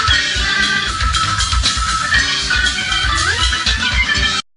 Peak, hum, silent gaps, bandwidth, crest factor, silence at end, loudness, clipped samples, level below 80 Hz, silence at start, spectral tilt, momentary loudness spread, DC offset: 0 dBFS; none; none; 11.5 kHz; 16 dB; 0.15 s; -14 LUFS; under 0.1%; -24 dBFS; 0 s; -1.5 dB/octave; 2 LU; under 0.1%